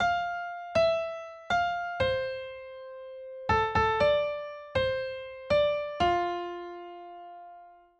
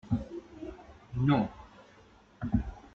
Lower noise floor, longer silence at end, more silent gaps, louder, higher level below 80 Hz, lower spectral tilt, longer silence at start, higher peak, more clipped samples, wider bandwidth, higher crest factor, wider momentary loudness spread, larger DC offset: second, -52 dBFS vs -59 dBFS; first, 0.25 s vs 0.05 s; neither; first, -29 LUFS vs -32 LUFS; second, -52 dBFS vs -46 dBFS; second, -5.5 dB/octave vs -9 dB/octave; about the same, 0 s vs 0.05 s; about the same, -14 dBFS vs -14 dBFS; neither; first, 9 kHz vs 7 kHz; about the same, 16 dB vs 20 dB; second, 18 LU vs 24 LU; neither